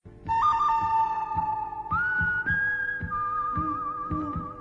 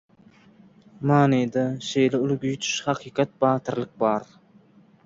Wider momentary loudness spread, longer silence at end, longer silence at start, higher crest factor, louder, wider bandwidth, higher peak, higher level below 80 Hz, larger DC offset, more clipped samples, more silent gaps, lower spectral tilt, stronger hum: about the same, 7 LU vs 7 LU; second, 0 s vs 0.85 s; second, 0.05 s vs 1 s; second, 12 dB vs 18 dB; second, -27 LUFS vs -24 LUFS; about the same, 7.8 kHz vs 7.8 kHz; second, -14 dBFS vs -6 dBFS; first, -46 dBFS vs -64 dBFS; neither; neither; neither; about the same, -6.5 dB/octave vs -5.5 dB/octave; neither